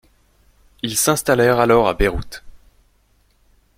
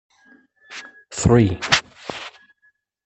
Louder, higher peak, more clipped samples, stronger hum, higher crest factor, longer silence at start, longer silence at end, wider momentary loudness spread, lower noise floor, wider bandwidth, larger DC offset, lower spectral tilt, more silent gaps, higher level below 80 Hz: about the same, -17 LUFS vs -18 LUFS; about the same, -2 dBFS vs -2 dBFS; neither; neither; about the same, 18 dB vs 22 dB; first, 0.85 s vs 0.7 s; first, 1.2 s vs 0.75 s; second, 17 LU vs 21 LU; second, -59 dBFS vs -63 dBFS; first, 16.5 kHz vs 8.6 kHz; neither; about the same, -4 dB/octave vs -4.5 dB/octave; neither; first, -34 dBFS vs -42 dBFS